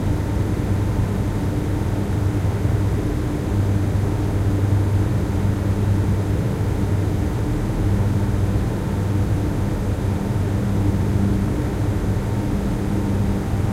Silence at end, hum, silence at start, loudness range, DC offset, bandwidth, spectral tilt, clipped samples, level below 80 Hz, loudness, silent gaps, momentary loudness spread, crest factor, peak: 0 s; none; 0 s; 1 LU; under 0.1%; 14.5 kHz; -8 dB/octave; under 0.1%; -28 dBFS; -21 LUFS; none; 3 LU; 12 dB; -8 dBFS